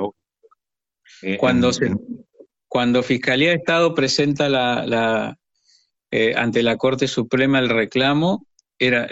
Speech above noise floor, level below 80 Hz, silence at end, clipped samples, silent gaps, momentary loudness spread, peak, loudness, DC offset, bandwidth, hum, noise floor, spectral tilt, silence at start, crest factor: 69 dB; -54 dBFS; 0 s; under 0.1%; none; 10 LU; -4 dBFS; -19 LUFS; under 0.1%; 8.2 kHz; none; -87 dBFS; -5 dB/octave; 0 s; 16 dB